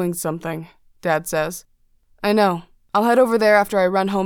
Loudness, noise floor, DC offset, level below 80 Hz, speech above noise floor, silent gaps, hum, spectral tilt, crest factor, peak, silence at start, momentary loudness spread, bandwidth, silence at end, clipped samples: -19 LUFS; -57 dBFS; under 0.1%; -54 dBFS; 38 dB; none; none; -5 dB/octave; 16 dB; -4 dBFS; 0 s; 14 LU; 20 kHz; 0 s; under 0.1%